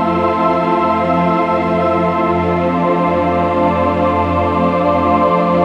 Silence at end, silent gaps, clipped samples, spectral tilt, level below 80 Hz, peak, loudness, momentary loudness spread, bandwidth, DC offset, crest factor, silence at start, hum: 0 s; none; under 0.1%; -8.5 dB/octave; -38 dBFS; 0 dBFS; -14 LUFS; 2 LU; 7.8 kHz; under 0.1%; 12 dB; 0 s; none